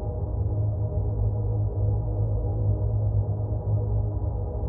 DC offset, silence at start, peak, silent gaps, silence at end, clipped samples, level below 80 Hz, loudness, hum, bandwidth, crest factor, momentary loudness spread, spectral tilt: under 0.1%; 0 s; -14 dBFS; none; 0 s; under 0.1%; -32 dBFS; -27 LUFS; none; 1.4 kHz; 12 dB; 3 LU; -13.5 dB/octave